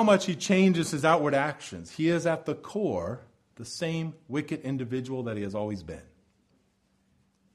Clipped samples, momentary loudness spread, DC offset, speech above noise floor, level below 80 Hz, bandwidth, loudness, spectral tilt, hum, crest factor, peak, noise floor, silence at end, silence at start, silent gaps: under 0.1%; 17 LU; under 0.1%; 42 dB; -62 dBFS; 13 kHz; -28 LUFS; -5.5 dB/octave; none; 22 dB; -8 dBFS; -70 dBFS; 1.5 s; 0 s; none